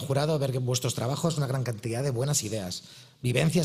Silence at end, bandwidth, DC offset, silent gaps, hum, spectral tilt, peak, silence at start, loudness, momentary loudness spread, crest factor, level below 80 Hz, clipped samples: 0 s; 16 kHz; under 0.1%; none; none; -5 dB/octave; -8 dBFS; 0 s; -28 LUFS; 8 LU; 20 dB; -58 dBFS; under 0.1%